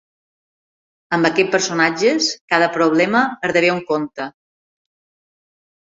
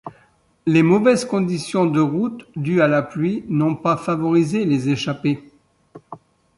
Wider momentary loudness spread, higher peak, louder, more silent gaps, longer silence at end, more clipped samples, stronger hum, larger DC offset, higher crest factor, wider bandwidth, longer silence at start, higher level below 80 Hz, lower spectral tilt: about the same, 8 LU vs 8 LU; first, 0 dBFS vs -4 dBFS; about the same, -17 LUFS vs -19 LUFS; first, 2.41-2.48 s vs none; first, 1.65 s vs 0.4 s; neither; neither; neither; about the same, 18 dB vs 16 dB; second, 8 kHz vs 11.5 kHz; first, 1.1 s vs 0.05 s; about the same, -64 dBFS vs -60 dBFS; second, -3.5 dB/octave vs -7 dB/octave